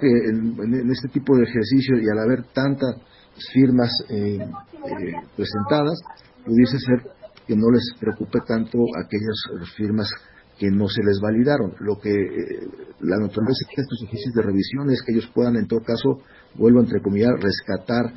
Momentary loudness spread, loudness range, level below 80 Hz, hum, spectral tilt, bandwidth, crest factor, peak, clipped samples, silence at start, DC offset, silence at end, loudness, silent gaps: 12 LU; 3 LU; -50 dBFS; none; -11 dB/octave; 5.8 kHz; 18 dB; -4 dBFS; under 0.1%; 0 s; under 0.1%; 0 s; -21 LUFS; none